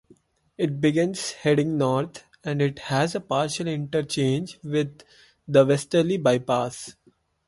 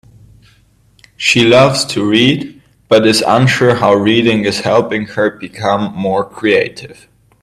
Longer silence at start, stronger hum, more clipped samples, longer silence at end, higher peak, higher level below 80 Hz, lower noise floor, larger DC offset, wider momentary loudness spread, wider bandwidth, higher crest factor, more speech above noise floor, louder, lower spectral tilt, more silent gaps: second, 0.6 s vs 1.2 s; neither; neither; about the same, 0.55 s vs 0.5 s; second, -6 dBFS vs 0 dBFS; second, -62 dBFS vs -50 dBFS; first, -59 dBFS vs -50 dBFS; neither; about the same, 10 LU vs 9 LU; second, 11.5 kHz vs 13.5 kHz; about the same, 18 dB vs 14 dB; about the same, 35 dB vs 38 dB; second, -24 LUFS vs -12 LUFS; about the same, -5.5 dB/octave vs -5 dB/octave; neither